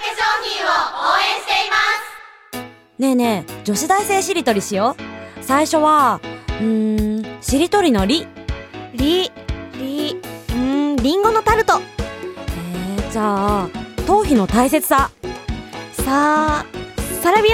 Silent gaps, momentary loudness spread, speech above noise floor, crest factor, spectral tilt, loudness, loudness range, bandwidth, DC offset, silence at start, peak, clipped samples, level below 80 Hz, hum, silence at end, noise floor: none; 15 LU; 21 dB; 16 dB; -4 dB/octave; -18 LUFS; 2 LU; 17.5 kHz; under 0.1%; 0 s; -2 dBFS; under 0.1%; -34 dBFS; none; 0 s; -37 dBFS